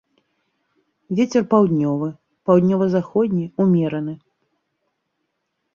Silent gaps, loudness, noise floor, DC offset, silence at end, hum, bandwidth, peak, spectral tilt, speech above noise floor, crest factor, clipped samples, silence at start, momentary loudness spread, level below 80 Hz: none; -19 LUFS; -75 dBFS; under 0.1%; 1.6 s; none; 7 kHz; -2 dBFS; -8.5 dB/octave; 57 dB; 18 dB; under 0.1%; 1.1 s; 12 LU; -62 dBFS